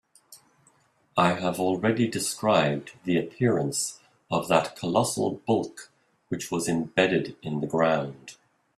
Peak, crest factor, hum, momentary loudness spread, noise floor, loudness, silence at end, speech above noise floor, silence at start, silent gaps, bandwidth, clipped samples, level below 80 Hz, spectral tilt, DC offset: -4 dBFS; 22 dB; none; 9 LU; -64 dBFS; -26 LUFS; 0.45 s; 38 dB; 0.3 s; none; 15 kHz; under 0.1%; -64 dBFS; -4.5 dB/octave; under 0.1%